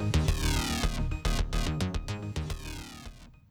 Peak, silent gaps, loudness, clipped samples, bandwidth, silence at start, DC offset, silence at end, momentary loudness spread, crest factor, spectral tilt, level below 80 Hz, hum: -14 dBFS; none; -32 LUFS; under 0.1%; over 20 kHz; 0 s; under 0.1%; 0.2 s; 14 LU; 16 dB; -4.5 dB/octave; -34 dBFS; none